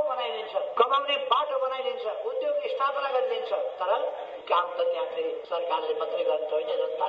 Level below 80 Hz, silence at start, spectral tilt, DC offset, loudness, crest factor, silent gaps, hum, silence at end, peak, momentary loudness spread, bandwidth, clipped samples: -78 dBFS; 0 s; -3 dB/octave; under 0.1%; -28 LUFS; 20 dB; none; none; 0 s; -6 dBFS; 6 LU; 6.4 kHz; under 0.1%